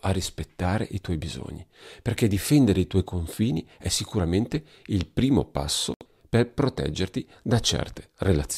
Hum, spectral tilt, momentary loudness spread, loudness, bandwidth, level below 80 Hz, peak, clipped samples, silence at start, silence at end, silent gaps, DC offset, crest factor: none; -5.5 dB/octave; 11 LU; -26 LUFS; 15.5 kHz; -42 dBFS; -8 dBFS; under 0.1%; 0.05 s; 0 s; 5.96-6.00 s; under 0.1%; 16 dB